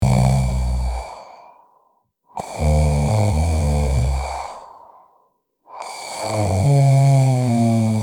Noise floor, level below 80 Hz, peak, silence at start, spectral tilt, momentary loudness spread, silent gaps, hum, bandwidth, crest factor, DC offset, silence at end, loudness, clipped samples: -63 dBFS; -28 dBFS; -4 dBFS; 0 s; -7 dB/octave; 19 LU; none; none; 16 kHz; 16 dB; under 0.1%; 0 s; -18 LUFS; under 0.1%